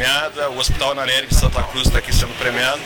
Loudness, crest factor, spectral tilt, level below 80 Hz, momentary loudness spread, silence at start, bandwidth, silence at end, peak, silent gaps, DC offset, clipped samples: -18 LUFS; 14 dB; -3 dB/octave; -22 dBFS; 4 LU; 0 s; 19.5 kHz; 0 s; -2 dBFS; none; under 0.1%; under 0.1%